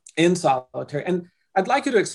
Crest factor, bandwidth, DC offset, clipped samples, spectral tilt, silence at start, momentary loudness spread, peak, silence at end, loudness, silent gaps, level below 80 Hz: 16 dB; 12 kHz; under 0.1%; under 0.1%; -5 dB/octave; 0.15 s; 9 LU; -6 dBFS; 0 s; -23 LUFS; none; -68 dBFS